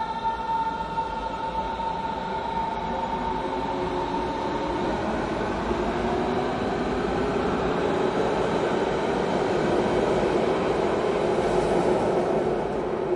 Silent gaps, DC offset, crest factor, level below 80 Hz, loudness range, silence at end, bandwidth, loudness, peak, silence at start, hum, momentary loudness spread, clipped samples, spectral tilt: none; under 0.1%; 16 dB; -44 dBFS; 5 LU; 0 s; 11 kHz; -26 LUFS; -10 dBFS; 0 s; none; 5 LU; under 0.1%; -6 dB/octave